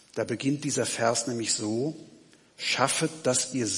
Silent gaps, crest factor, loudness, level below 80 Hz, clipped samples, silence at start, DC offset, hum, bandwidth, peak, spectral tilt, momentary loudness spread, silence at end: none; 22 dB; -27 LUFS; -74 dBFS; under 0.1%; 0.15 s; under 0.1%; none; 11.5 kHz; -8 dBFS; -3 dB/octave; 7 LU; 0 s